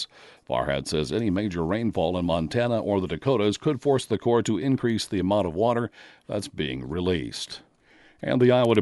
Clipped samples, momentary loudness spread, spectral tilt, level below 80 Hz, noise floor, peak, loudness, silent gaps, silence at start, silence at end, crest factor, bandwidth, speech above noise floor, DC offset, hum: under 0.1%; 9 LU; -6 dB/octave; -50 dBFS; -57 dBFS; -6 dBFS; -25 LUFS; none; 0 s; 0 s; 18 dB; 11.5 kHz; 33 dB; under 0.1%; none